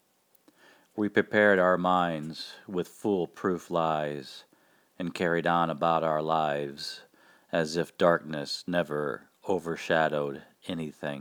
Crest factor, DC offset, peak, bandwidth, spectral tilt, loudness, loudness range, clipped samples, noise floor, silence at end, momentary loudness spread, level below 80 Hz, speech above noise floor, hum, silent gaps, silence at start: 22 dB; under 0.1%; -8 dBFS; over 20 kHz; -5.5 dB/octave; -28 LUFS; 3 LU; under 0.1%; -65 dBFS; 0 s; 14 LU; -68 dBFS; 36 dB; none; none; 0.95 s